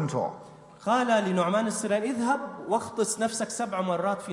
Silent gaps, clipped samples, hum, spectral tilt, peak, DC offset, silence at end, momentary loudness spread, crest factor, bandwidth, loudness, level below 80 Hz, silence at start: none; under 0.1%; none; -4.5 dB/octave; -12 dBFS; under 0.1%; 0 s; 6 LU; 16 dB; 11.5 kHz; -27 LUFS; -72 dBFS; 0 s